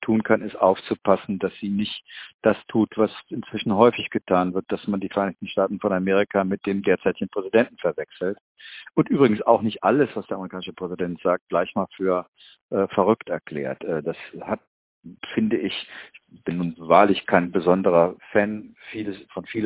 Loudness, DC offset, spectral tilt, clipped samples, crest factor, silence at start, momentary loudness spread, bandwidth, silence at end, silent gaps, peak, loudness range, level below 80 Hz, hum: -23 LUFS; under 0.1%; -10.5 dB/octave; under 0.1%; 22 dB; 0 s; 13 LU; 4 kHz; 0 s; 2.34-2.39 s, 8.41-8.55 s, 11.41-11.47 s, 12.28-12.33 s, 12.62-12.69 s, 14.67-15.01 s; 0 dBFS; 5 LU; -58 dBFS; none